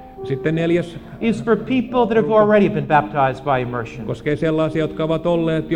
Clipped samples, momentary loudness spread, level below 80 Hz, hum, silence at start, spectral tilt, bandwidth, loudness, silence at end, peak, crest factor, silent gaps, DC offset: under 0.1%; 10 LU; -44 dBFS; none; 0 s; -8 dB/octave; 10 kHz; -19 LUFS; 0 s; -2 dBFS; 16 dB; none; under 0.1%